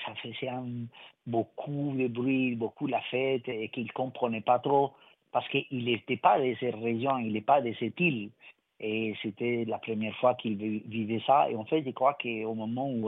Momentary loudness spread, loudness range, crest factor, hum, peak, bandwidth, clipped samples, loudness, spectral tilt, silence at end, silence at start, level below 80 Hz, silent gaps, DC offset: 10 LU; 3 LU; 22 dB; none; -8 dBFS; 4 kHz; under 0.1%; -30 LUFS; -9.5 dB/octave; 0 s; 0 s; -78 dBFS; none; under 0.1%